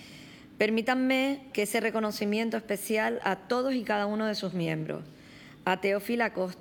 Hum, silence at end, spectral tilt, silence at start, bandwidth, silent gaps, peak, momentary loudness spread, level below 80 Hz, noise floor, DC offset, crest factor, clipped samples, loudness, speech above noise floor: none; 0 s; -5 dB/octave; 0 s; 19.5 kHz; none; -10 dBFS; 11 LU; -68 dBFS; -51 dBFS; under 0.1%; 20 dB; under 0.1%; -29 LUFS; 22 dB